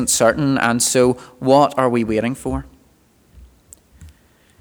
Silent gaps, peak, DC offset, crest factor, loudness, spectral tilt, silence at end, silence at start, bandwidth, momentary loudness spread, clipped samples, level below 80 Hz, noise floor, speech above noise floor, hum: none; 0 dBFS; under 0.1%; 18 dB; -17 LUFS; -4 dB/octave; 0.5 s; 0 s; over 20 kHz; 10 LU; under 0.1%; -42 dBFS; -55 dBFS; 38 dB; none